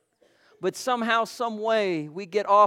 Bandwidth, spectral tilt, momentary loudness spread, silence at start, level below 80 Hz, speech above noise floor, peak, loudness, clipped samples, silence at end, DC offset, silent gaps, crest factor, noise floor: 16 kHz; -4 dB/octave; 8 LU; 0.6 s; -78 dBFS; 39 dB; -6 dBFS; -26 LUFS; under 0.1%; 0 s; under 0.1%; none; 18 dB; -62 dBFS